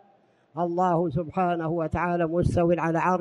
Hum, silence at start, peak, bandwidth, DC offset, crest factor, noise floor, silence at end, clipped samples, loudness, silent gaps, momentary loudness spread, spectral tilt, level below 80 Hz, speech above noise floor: none; 0.55 s; -10 dBFS; 11 kHz; under 0.1%; 14 dB; -61 dBFS; 0 s; under 0.1%; -25 LUFS; none; 5 LU; -8.5 dB/octave; -46 dBFS; 37 dB